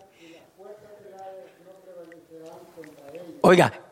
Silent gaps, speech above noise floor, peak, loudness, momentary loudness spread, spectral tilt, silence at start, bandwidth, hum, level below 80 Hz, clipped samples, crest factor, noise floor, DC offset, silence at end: none; 28 dB; -4 dBFS; -19 LUFS; 29 LU; -6 dB/octave; 1.25 s; 15 kHz; none; -66 dBFS; under 0.1%; 22 dB; -51 dBFS; under 0.1%; 0.2 s